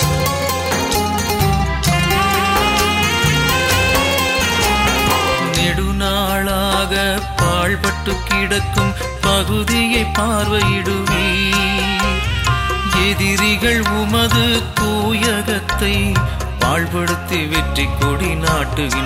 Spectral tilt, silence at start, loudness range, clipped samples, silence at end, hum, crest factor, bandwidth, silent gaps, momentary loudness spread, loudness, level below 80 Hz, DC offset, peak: -4 dB/octave; 0 s; 3 LU; under 0.1%; 0 s; none; 16 dB; 16.5 kHz; none; 4 LU; -16 LUFS; -26 dBFS; under 0.1%; 0 dBFS